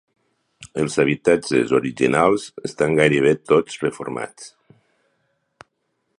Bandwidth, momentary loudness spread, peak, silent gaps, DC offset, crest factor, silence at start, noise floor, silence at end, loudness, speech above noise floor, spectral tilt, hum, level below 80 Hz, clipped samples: 11.5 kHz; 15 LU; -2 dBFS; none; under 0.1%; 20 dB; 0.6 s; -72 dBFS; 1.7 s; -19 LUFS; 53 dB; -5.5 dB/octave; none; -56 dBFS; under 0.1%